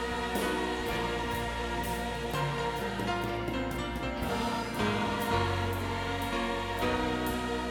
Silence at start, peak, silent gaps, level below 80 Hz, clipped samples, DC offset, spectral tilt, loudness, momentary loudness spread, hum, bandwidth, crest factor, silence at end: 0 s; -16 dBFS; none; -44 dBFS; under 0.1%; under 0.1%; -5 dB/octave; -32 LUFS; 4 LU; none; over 20 kHz; 16 dB; 0 s